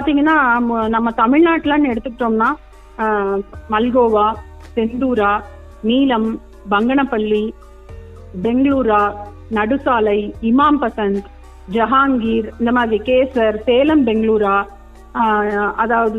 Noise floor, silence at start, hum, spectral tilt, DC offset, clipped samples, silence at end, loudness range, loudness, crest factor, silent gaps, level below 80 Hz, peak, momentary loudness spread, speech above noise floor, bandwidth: -36 dBFS; 0 s; none; -7.5 dB/octave; under 0.1%; under 0.1%; 0 s; 3 LU; -16 LUFS; 16 dB; none; -38 dBFS; 0 dBFS; 10 LU; 20 dB; 6.8 kHz